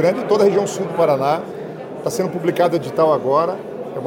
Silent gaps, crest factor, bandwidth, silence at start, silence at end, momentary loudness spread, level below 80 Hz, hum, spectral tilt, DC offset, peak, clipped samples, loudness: none; 14 dB; 17 kHz; 0 s; 0 s; 13 LU; -62 dBFS; none; -6 dB/octave; under 0.1%; -4 dBFS; under 0.1%; -18 LUFS